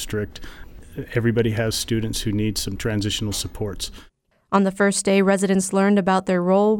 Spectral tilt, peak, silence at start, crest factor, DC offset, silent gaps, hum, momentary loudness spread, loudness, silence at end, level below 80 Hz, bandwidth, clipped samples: -5 dB/octave; -4 dBFS; 0 s; 18 dB; under 0.1%; none; none; 14 LU; -21 LUFS; 0 s; -40 dBFS; 18 kHz; under 0.1%